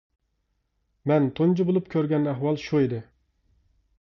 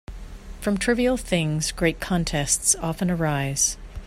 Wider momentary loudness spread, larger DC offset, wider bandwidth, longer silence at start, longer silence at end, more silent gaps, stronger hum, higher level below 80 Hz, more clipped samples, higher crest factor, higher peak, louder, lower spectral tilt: about the same, 6 LU vs 8 LU; neither; second, 6.8 kHz vs 16 kHz; first, 1.05 s vs 0.1 s; first, 1 s vs 0 s; neither; neither; second, -62 dBFS vs -38 dBFS; neither; about the same, 16 dB vs 20 dB; second, -10 dBFS vs -4 dBFS; about the same, -24 LUFS vs -23 LUFS; first, -9 dB/octave vs -4 dB/octave